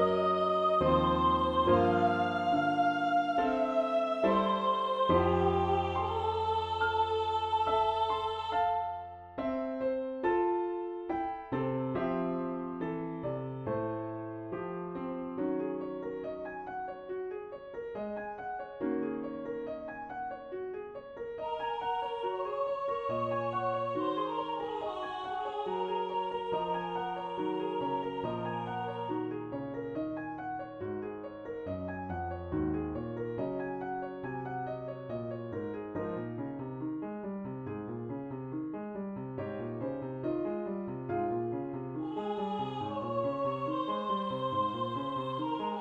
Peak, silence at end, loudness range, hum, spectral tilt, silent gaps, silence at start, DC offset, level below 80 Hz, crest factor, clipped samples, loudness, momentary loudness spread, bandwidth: -14 dBFS; 0 s; 10 LU; none; -8 dB/octave; none; 0 s; under 0.1%; -58 dBFS; 18 dB; under 0.1%; -34 LUFS; 11 LU; 8.8 kHz